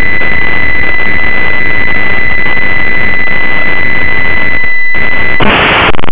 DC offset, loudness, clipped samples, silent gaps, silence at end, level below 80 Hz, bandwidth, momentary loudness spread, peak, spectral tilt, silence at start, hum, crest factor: 70%; -8 LUFS; 30%; none; 0 s; -26 dBFS; 4 kHz; 3 LU; 0 dBFS; -7 dB/octave; 0 s; none; 14 dB